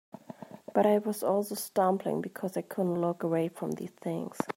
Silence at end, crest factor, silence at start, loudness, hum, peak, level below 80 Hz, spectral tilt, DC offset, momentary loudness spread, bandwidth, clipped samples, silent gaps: 0.05 s; 18 dB; 0.3 s; -31 LUFS; none; -12 dBFS; -78 dBFS; -6.5 dB/octave; under 0.1%; 11 LU; 16 kHz; under 0.1%; none